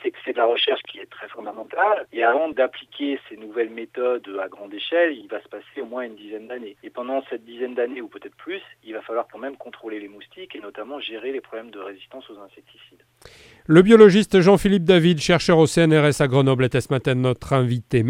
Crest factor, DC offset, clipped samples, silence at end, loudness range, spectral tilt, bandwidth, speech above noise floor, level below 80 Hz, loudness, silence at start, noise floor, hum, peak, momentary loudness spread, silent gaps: 20 dB; under 0.1%; under 0.1%; 0 s; 18 LU; -6 dB/octave; 15.5 kHz; 28 dB; -52 dBFS; -19 LUFS; 0.05 s; -49 dBFS; none; 0 dBFS; 21 LU; none